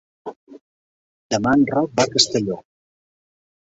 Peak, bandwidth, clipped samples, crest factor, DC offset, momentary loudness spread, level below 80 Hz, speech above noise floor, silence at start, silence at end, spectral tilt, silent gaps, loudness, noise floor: -2 dBFS; 8.2 kHz; under 0.1%; 22 dB; under 0.1%; 21 LU; -56 dBFS; over 71 dB; 0.25 s; 1.2 s; -3.5 dB/octave; 0.36-0.47 s, 0.61-1.30 s; -19 LUFS; under -90 dBFS